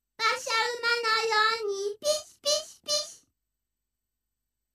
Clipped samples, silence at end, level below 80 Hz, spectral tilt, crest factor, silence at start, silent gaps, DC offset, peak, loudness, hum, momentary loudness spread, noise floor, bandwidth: under 0.1%; 1.6 s; -76 dBFS; 1.5 dB/octave; 20 dB; 0.2 s; none; under 0.1%; -12 dBFS; -27 LUFS; 50 Hz at -85 dBFS; 6 LU; -86 dBFS; 14.5 kHz